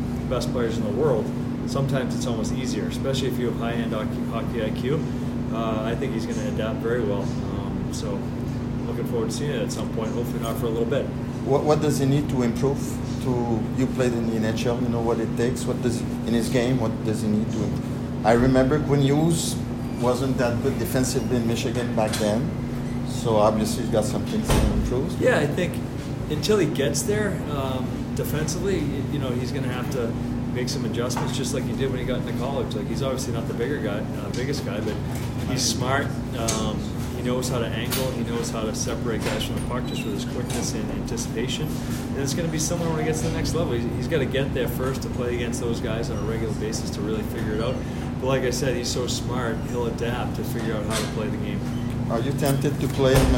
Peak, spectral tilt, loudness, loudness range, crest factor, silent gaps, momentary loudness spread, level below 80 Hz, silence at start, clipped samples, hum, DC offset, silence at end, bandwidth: -4 dBFS; -5.5 dB/octave; -25 LUFS; 4 LU; 20 dB; none; 7 LU; -38 dBFS; 0 s; under 0.1%; none; under 0.1%; 0 s; 16.5 kHz